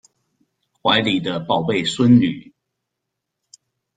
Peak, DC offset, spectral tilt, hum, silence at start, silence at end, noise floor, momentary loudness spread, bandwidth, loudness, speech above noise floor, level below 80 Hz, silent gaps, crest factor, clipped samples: -2 dBFS; under 0.1%; -5.5 dB/octave; none; 0.85 s; 1.55 s; -80 dBFS; 9 LU; 9.2 kHz; -18 LUFS; 63 dB; -58 dBFS; none; 18 dB; under 0.1%